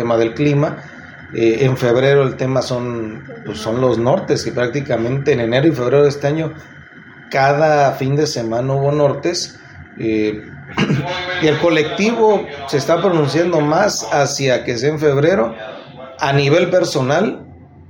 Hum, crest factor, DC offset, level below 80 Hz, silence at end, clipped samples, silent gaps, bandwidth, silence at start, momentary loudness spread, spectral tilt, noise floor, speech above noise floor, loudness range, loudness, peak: none; 14 dB; under 0.1%; -52 dBFS; 0.1 s; under 0.1%; none; 17 kHz; 0 s; 12 LU; -5.5 dB/octave; -39 dBFS; 24 dB; 3 LU; -16 LUFS; -2 dBFS